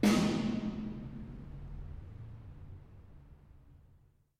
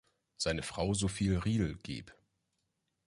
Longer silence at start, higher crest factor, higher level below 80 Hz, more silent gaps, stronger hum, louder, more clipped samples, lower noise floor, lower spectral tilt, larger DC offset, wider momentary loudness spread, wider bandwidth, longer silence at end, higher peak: second, 0 s vs 0.4 s; about the same, 20 dB vs 16 dB; about the same, -52 dBFS vs -50 dBFS; neither; neither; second, -37 LUFS vs -34 LUFS; neither; second, -65 dBFS vs -83 dBFS; about the same, -5.5 dB/octave vs -5 dB/octave; neither; first, 26 LU vs 12 LU; first, 15.5 kHz vs 11.5 kHz; second, 0.65 s vs 0.95 s; first, -16 dBFS vs -20 dBFS